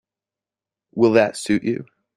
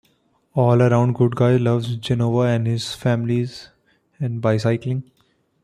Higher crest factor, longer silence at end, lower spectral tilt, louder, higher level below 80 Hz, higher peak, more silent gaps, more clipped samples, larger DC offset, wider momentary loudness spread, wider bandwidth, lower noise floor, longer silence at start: about the same, 20 dB vs 16 dB; second, 0.35 s vs 0.6 s; second, -5.5 dB/octave vs -7.5 dB/octave; about the same, -19 LUFS vs -20 LUFS; second, -62 dBFS vs -54 dBFS; about the same, -2 dBFS vs -4 dBFS; neither; neither; neither; about the same, 13 LU vs 11 LU; about the same, 12 kHz vs 11 kHz; first, -89 dBFS vs -63 dBFS; first, 0.95 s vs 0.55 s